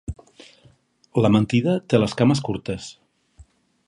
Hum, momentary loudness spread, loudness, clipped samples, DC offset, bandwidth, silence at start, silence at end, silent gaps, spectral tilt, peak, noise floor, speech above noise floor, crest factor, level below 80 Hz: none; 18 LU; -21 LUFS; under 0.1%; under 0.1%; 11.5 kHz; 0.1 s; 0.45 s; none; -7 dB/octave; -4 dBFS; -57 dBFS; 37 dB; 20 dB; -46 dBFS